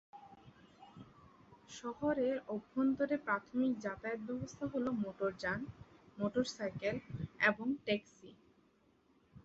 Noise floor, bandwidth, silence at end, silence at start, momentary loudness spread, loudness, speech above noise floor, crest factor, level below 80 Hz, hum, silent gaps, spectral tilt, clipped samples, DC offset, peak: -71 dBFS; 8 kHz; 0.05 s; 0.15 s; 23 LU; -38 LUFS; 34 dB; 22 dB; -68 dBFS; none; none; -4.5 dB/octave; under 0.1%; under 0.1%; -18 dBFS